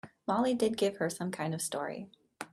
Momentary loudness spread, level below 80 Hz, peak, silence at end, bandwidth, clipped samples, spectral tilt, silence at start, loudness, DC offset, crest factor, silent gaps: 15 LU; -72 dBFS; -18 dBFS; 0.05 s; 15 kHz; under 0.1%; -4.5 dB/octave; 0.05 s; -33 LUFS; under 0.1%; 16 dB; none